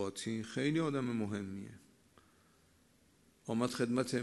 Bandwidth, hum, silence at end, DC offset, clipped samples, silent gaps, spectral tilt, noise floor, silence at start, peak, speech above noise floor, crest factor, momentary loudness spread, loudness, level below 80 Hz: 12 kHz; none; 0 s; under 0.1%; under 0.1%; none; -5.5 dB/octave; -69 dBFS; 0 s; -20 dBFS; 33 dB; 18 dB; 13 LU; -37 LUFS; -76 dBFS